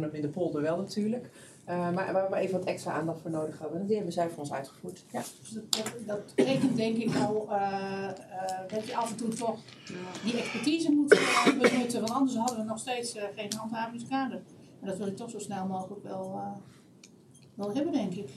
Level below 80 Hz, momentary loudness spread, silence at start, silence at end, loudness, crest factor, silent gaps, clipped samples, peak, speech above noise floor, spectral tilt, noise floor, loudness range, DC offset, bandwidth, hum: -80 dBFS; 13 LU; 0 s; 0 s; -31 LUFS; 26 dB; none; under 0.1%; -6 dBFS; 25 dB; -4.5 dB/octave; -56 dBFS; 9 LU; under 0.1%; 14.5 kHz; none